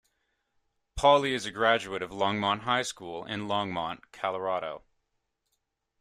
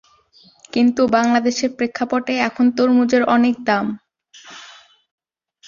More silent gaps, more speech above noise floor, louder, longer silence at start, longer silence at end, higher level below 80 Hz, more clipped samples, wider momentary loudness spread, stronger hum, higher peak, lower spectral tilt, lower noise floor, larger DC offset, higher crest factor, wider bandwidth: neither; first, 52 dB vs 36 dB; second, -28 LUFS vs -17 LUFS; first, 0.95 s vs 0.75 s; first, 1.2 s vs 0.95 s; first, -54 dBFS vs -60 dBFS; neither; second, 14 LU vs 21 LU; neither; second, -8 dBFS vs -2 dBFS; about the same, -4 dB/octave vs -4.5 dB/octave; first, -80 dBFS vs -52 dBFS; neither; about the same, 22 dB vs 18 dB; first, 14 kHz vs 7.4 kHz